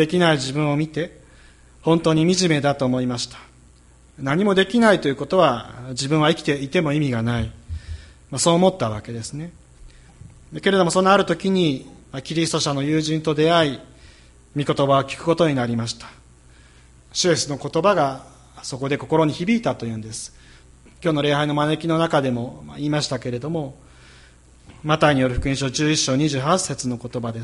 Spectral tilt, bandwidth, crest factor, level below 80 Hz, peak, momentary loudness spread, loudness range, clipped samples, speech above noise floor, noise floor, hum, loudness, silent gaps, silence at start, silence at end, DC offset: -5 dB/octave; 11.5 kHz; 20 dB; -44 dBFS; 0 dBFS; 15 LU; 4 LU; under 0.1%; 30 dB; -50 dBFS; none; -20 LUFS; none; 0 s; 0 s; under 0.1%